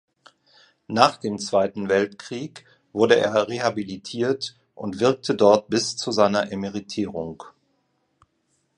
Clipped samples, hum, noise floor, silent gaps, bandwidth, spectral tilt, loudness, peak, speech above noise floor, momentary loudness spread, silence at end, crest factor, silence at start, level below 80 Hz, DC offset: under 0.1%; none; -70 dBFS; none; 10.5 kHz; -4.5 dB/octave; -22 LUFS; 0 dBFS; 48 dB; 15 LU; 1.3 s; 24 dB; 0.9 s; -60 dBFS; under 0.1%